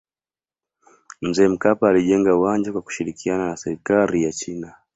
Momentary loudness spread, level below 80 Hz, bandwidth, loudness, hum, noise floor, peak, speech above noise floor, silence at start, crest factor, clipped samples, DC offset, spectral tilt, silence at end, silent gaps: 12 LU; -54 dBFS; 8.2 kHz; -20 LUFS; none; under -90 dBFS; -2 dBFS; over 71 dB; 1.2 s; 18 dB; under 0.1%; under 0.1%; -5.5 dB/octave; 0.25 s; none